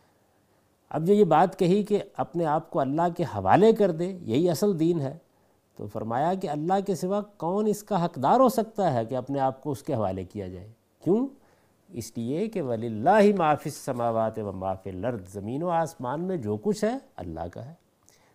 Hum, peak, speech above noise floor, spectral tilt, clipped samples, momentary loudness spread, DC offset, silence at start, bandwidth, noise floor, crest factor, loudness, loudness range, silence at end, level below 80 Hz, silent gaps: none; -6 dBFS; 40 dB; -7 dB/octave; under 0.1%; 15 LU; under 0.1%; 0.9 s; 15.5 kHz; -65 dBFS; 22 dB; -26 LUFS; 6 LU; 0.6 s; -64 dBFS; none